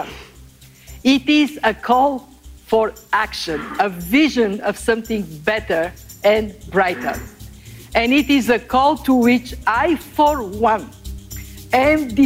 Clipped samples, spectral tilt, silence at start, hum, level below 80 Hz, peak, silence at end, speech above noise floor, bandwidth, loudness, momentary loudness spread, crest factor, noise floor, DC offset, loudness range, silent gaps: under 0.1%; -4.5 dB/octave; 0 s; none; -40 dBFS; -4 dBFS; 0 s; 27 dB; 16 kHz; -18 LUFS; 15 LU; 14 dB; -44 dBFS; under 0.1%; 3 LU; none